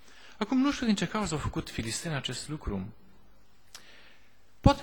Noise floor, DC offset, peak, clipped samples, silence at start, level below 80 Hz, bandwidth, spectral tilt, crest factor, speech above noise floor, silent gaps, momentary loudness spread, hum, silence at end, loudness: -63 dBFS; 0.3%; -6 dBFS; under 0.1%; 0.25 s; -44 dBFS; 19 kHz; -5 dB/octave; 24 dB; 32 dB; none; 21 LU; none; 0 s; -31 LUFS